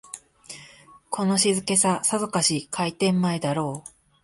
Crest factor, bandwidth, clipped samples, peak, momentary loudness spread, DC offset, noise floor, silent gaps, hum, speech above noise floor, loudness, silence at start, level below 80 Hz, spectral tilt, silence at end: 18 dB; 12 kHz; under 0.1%; -6 dBFS; 21 LU; under 0.1%; -50 dBFS; none; none; 27 dB; -23 LUFS; 0.15 s; -64 dBFS; -3.5 dB/octave; 0.35 s